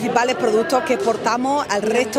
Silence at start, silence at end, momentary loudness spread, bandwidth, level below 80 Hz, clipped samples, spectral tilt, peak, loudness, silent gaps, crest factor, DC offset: 0 s; 0 s; 2 LU; 16 kHz; -58 dBFS; under 0.1%; -3.5 dB/octave; 0 dBFS; -19 LUFS; none; 18 dB; under 0.1%